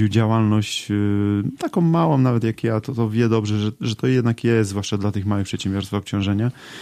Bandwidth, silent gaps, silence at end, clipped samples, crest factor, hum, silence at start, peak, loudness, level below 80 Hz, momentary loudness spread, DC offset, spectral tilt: 13 kHz; none; 0 s; under 0.1%; 14 dB; none; 0 s; -6 dBFS; -21 LUFS; -54 dBFS; 6 LU; under 0.1%; -6.5 dB/octave